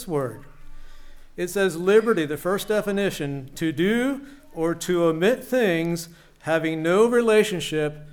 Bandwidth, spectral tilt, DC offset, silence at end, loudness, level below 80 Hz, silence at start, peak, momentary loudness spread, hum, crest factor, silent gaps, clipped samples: 18.5 kHz; -5 dB/octave; under 0.1%; 0 s; -23 LUFS; -48 dBFS; 0 s; -6 dBFS; 13 LU; none; 18 dB; none; under 0.1%